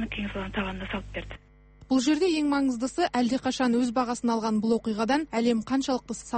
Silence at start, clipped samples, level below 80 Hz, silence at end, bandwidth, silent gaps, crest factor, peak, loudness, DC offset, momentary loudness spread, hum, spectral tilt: 0 s; under 0.1%; -48 dBFS; 0 s; 8.8 kHz; none; 14 dB; -12 dBFS; -27 LUFS; under 0.1%; 10 LU; none; -4.5 dB/octave